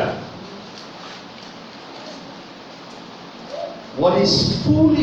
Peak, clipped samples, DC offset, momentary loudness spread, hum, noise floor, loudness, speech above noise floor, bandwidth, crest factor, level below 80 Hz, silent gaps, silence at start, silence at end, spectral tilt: -4 dBFS; under 0.1%; under 0.1%; 21 LU; none; -38 dBFS; -19 LUFS; 23 dB; 8.4 kHz; 18 dB; -50 dBFS; none; 0 s; 0 s; -5.5 dB/octave